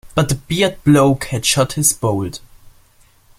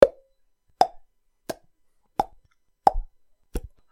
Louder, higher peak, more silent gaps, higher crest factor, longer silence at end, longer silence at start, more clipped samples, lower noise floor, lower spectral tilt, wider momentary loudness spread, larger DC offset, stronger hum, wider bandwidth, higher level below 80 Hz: first, -16 LUFS vs -26 LUFS; about the same, 0 dBFS vs 0 dBFS; neither; second, 18 dB vs 26 dB; first, 0.7 s vs 0.3 s; about the same, 0.05 s vs 0 s; neither; second, -51 dBFS vs -65 dBFS; about the same, -4.5 dB/octave vs -5 dB/octave; second, 9 LU vs 16 LU; neither; neither; about the same, 16 kHz vs 16.5 kHz; about the same, -42 dBFS vs -40 dBFS